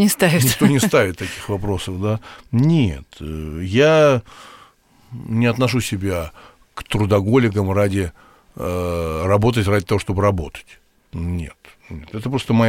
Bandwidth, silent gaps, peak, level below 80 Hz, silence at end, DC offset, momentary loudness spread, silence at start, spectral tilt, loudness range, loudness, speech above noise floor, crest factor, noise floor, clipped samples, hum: 17 kHz; none; 0 dBFS; -40 dBFS; 0 s; under 0.1%; 18 LU; 0 s; -5.5 dB/octave; 3 LU; -19 LUFS; 33 dB; 18 dB; -51 dBFS; under 0.1%; none